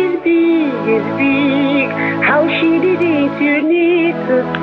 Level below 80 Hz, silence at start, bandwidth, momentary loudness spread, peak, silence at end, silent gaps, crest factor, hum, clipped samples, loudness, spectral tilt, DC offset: -54 dBFS; 0 s; 5.2 kHz; 3 LU; -2 dBFS; 0 s; none; 10 dB; none; under 0.1%; -14 LUFS; -8 dB/octave; under 0.1%